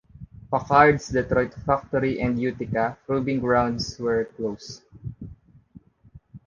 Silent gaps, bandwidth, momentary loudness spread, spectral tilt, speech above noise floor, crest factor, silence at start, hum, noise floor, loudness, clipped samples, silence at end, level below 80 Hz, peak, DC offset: none; 7.4 kHz; 21 LU; -6.5 dB/octave; 29 dB; 22 dB; 0.2 s; none; -52 dBFS; -23 LUFS; under 0.1%; 0.1 s; -46 dBFS; -2 dBFS; under 0.1%